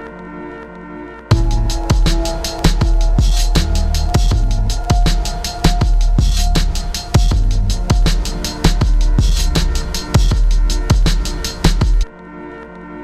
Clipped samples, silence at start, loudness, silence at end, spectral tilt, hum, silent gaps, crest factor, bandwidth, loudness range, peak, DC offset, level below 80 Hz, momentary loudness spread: under 0.1%; 0 s; -17 LUFS; 0 s; -5 dB/octave; none; none; 14 dB; 13.5 kHz; 1 LU; 0 dBFS; under 0.1%; -14 dBFS; 15 LU